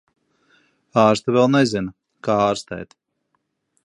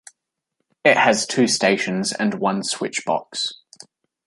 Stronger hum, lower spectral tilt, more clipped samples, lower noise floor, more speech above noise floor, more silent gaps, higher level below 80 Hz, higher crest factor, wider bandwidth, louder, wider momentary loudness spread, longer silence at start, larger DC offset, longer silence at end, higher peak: neither; first, -6 dB/octave vs -3 dB/octave; neither; second, -72 dBFS vs -77 dBFS; about the same, 54 dB vs 57 dB; neither; first, -56 dBFS vs -68 dBFS; about the same, 20 dB vs 22 dB; about the same, 11.5 kHz vs 11.5 kHz; about the same, -19 LUFS vs -20 LUFS; first, 17 LU vs 9 LU; about the same, 0.95 s vs 0.85 s; neither; first, 1 s vs 0.7 s; about the same, -2 dBFS vs 0 dBFS